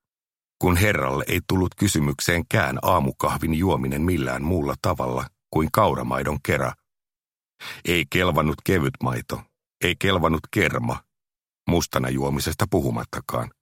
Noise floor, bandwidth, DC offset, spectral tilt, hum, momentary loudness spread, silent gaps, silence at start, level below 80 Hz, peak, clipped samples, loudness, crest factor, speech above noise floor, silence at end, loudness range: under -90 dBFS; 16.5 kHz; under 0.1%; -5 dB/octave; none; 9 LU; none; 0.6 s; -40 dBFS; -2 dBFS; under 0.1%; -23 LUFS; 22 dB; over 67 dB; 0.15 s; 3 LU